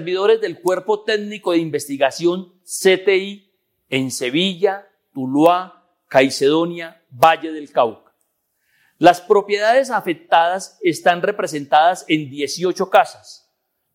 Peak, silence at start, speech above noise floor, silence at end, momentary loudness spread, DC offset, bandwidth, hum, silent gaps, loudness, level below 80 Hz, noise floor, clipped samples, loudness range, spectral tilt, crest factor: 0 dBFS; 0 s; 53 dB; 0.6 s; 10 LU; under 0.1%; 16.5 kHz; none; none; -18 LUFS; -66 dBFS; -71 dBFS; under 0.1%; 3 LU; -4 dB/octave; 18 dB